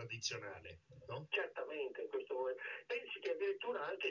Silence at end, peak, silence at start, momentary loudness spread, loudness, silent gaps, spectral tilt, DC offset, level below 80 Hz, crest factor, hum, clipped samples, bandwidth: 0 s; -28 dBFS; 0 s; 10 LU; -43 LUFS; none; -2 dB/octave; under 0.1%; -76 dBFS; 16 dB; none; under 0.1%; 7.2 kHz